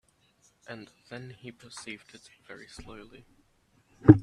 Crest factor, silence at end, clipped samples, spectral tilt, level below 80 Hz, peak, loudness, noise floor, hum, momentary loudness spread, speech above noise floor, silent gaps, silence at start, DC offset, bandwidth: 28 dB; 0 s; under 0.1%; -8 dB/octave; -54 dBFS; 0 dBFS; -29 LUFS; -67 dBFS; none; 20 LU; 21 dB; none; 1.9 s; under 0.1%; 10.5 kHz